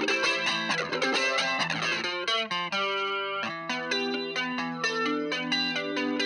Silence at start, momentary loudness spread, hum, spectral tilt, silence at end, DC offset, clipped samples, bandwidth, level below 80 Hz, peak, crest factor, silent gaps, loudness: 0 s; 5 LU; none; -2.5 dB/octave; 0 s; under 0.1%; under 0.1%; 11.5 kHz; -78 dBFS; -12 dBFS; 16 dB; none; -27 LUFS